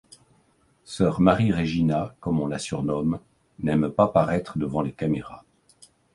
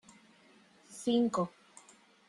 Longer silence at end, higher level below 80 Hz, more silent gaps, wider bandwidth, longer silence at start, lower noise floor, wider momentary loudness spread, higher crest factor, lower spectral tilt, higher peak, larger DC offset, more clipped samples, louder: about the same, 0.75 s vs 0.8 s; first, -48 dBFS vs -78 dBFS; neither; about the same, 11.5 kHz vs 12 kHz; about the same, 0.9 s vs 0.9 s; about the same, -63 dBFS vs -63 dBFS; second, 9 LU vs 22 LU; about the same, 20 dB vs 18 dB; first, -7 dB/octave vs -5.5 dB/octave; first, -4 dBFS vs -18 dBFS; neither; neither; first, -24 LUFS vs -33 LUFS